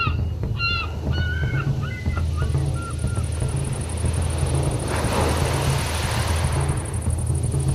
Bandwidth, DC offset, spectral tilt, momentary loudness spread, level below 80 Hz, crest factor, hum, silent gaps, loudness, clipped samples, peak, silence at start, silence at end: 14.5 kHz; under 0.1%; -5 dB/octave; 4 LU; -28 dBFS; 14 dB; none; none; -24 LUFS; under 0.1%; -8 dBFS; 0 s; 0 s